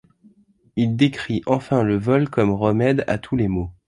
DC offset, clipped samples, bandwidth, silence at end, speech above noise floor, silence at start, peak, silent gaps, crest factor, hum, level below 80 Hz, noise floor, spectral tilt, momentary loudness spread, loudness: under 0.1%; under 0.1%; 11 kHz; 0.15 s; 36 dB; 0.75 s; -2 dBFS; none; 18 dB; none; -44 dBFS; -55 dBFS; -8 dB/octave; 5 LU; -20 LUFS